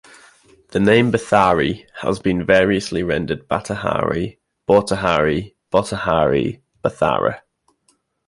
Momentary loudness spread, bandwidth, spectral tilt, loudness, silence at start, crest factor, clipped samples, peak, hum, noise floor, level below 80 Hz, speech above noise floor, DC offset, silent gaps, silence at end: 10 LU; 11.5 kHz; -6 dB/octave; -18 LUFS; 0.7 s; 18 dB; under 0.1%; 0 dBFS; none; -64 dBFS; -44 dBFS; 46 dB; under 0.1%; none; 0.9 s